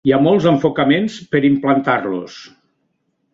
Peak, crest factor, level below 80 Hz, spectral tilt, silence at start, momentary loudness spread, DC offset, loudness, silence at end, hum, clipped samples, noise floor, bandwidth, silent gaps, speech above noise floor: -2 dBFS; 14 dB; -54 dBFS; -7 dB/octave; 0.05 s; 10 LU; under 0.1%; -16 LUFS; 0.85 s; none; under 0.1%; -68 dBFS; 7.6 kHz; none; 53 dB